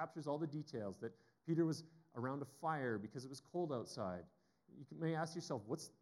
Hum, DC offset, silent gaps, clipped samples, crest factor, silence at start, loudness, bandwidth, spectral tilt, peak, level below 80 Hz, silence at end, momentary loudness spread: none; under 0.1%; none; under 0.1%; 18 dB; 0 s; -44 LUFS; 12.5 kHz; -6.5 dB/octave; -26 dBFS; under -90 dBFS; 0.1 s; 12 LU